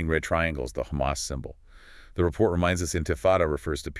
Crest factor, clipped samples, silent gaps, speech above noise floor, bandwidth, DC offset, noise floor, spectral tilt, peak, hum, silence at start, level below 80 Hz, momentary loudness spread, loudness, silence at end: 20 dB; under 0.1%; none; 23 dB; 12 kHz; under 0.1%; -49 dBFS; -5 dB/octave; -8 dBFS; none; 0 s; -40 dBFS; 10 LU; -26 LUFS; 0 s